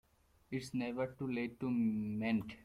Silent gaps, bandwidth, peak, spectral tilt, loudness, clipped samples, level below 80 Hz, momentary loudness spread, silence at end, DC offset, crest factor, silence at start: none; 13.5 kHz; -26 dBFS; -7 dB/octave; -39 LUFS; under 0.1%; -68 dBFS; 6 LU; 0 s; under 0.1%; 14 dB; 0.5 s